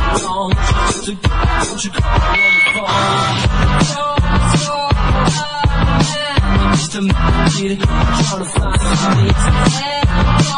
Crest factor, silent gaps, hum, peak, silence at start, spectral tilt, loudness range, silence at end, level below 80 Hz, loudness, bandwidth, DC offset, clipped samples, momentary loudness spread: 14 dB; none; none; 0 dBFS; 0 s; -4.5 dB/octave; 2 LU; 0 s; -18 dBFS; -14 LUFS; 10.5 kHz; under 0.1%; under 0.1%; 4 LU